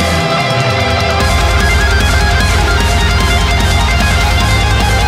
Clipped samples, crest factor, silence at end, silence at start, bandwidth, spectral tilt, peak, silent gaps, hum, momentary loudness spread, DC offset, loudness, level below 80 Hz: under 0.1%; 10 dB; 0 s; 0 s; 16 kHz; -4 dB/octave; 0 dBFS; none; none; 1 LU; under 0.1%; -11 LUFS; -16 dBFS